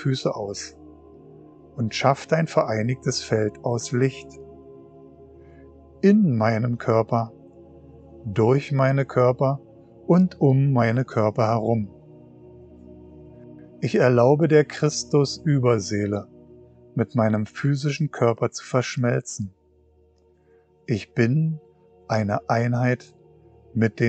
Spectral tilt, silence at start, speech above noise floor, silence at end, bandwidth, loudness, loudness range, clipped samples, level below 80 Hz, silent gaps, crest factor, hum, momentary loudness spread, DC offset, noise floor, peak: -6.5 dB/octave; 0 s; 37 dB; 0 s; 8.8 kHz; -22 LUFS; 6 LU; under 0.1%; -58 dBFS; none; 20 dB; none; 13 LU; under 0.1%; -59 dBFS; -2 dBFS